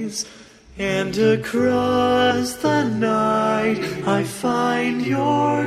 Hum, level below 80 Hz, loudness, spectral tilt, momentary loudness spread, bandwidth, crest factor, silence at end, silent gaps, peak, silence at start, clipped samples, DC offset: none; -52 dBFS; -20 LUFS; -5 dB/octave; 6 LU; 15 kHz; 14 dB; 0 s; none; -6 dBFS; 0 s; under 0.1%; under 0.1%